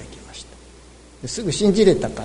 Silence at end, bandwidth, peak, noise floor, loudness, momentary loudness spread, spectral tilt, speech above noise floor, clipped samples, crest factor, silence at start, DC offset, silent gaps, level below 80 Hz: 0 s; 11 kHz; -4 dBFS; -45 dBFS; -18 LUFS; 22 LU; -5 dB/octave; 27 dB; under 0.1%; 18 dB; 0 s; under 0.1%; none; -42 dBFS